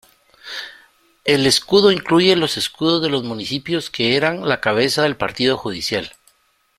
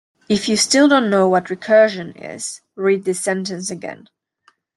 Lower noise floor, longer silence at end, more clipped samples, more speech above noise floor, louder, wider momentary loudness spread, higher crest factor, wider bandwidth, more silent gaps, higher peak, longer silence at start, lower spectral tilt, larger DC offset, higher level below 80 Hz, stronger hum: about the same, -61 dBFS vs -59 dBFS; about the same, 0.7 s vs 0.8 s; neither; about the same, 44 dB vs 42 dB; about the same, -17 LUFS vs -17 LUFS; second, 13 LU vs 16 LU; about the same, 18 dB vs 16 dB; first, 15.5 kHz vs 12.5 kHz; neither; about the same, 0 dBFS vs -2 dBFS; first, 0.45 s vs 0.3 s; about the same, -4 dB/octave vs -3.5 dB/octave; neither; first, -54 dBFS vs -60 dBFS; neither